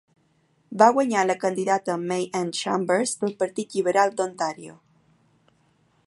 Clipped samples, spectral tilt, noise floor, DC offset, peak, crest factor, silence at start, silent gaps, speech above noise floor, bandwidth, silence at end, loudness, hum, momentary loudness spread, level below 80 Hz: under 0.1%; -4 dB/octave; -65 dBFS; under 0.1%; -2 dBFS; 22 dB; 0.7 s; none; 42 dB; 11.5 kHz; 1.35 s; -23 LUFS; none; 11 LU; -76 dBFS